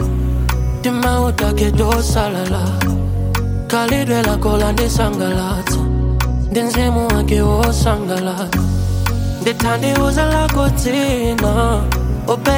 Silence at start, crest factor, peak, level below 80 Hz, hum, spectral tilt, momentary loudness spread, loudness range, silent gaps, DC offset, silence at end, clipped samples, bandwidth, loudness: 0 s; 14 dB; 0 dBFS; -20 dBFS; none; -5.5 dB/octave; 4 LU; 1 LU; none; under 0.1%; 0 s; under 0.1%; 17 kHz; -16 LUFS